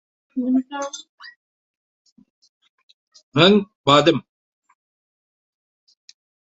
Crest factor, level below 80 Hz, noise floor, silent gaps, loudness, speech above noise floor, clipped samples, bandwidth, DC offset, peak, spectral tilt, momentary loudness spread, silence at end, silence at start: 22 dB; -62 dBFS; under -90 dBFS; 1.09-1.18 s, 1.36-2.05 s, 2.12-2.16 s, 2.30-2.42 s, 2.49-2.61 s, 2.69-3.12 s, 3.23-3.32 s, 3.75-3.84 s; -18 LUFS; over 72 dB; under 0.1%; 8 kHz; under 0.1%; -2 dBFS; -5 dB/octave; 17 LU; 2.35 s; 0.35 s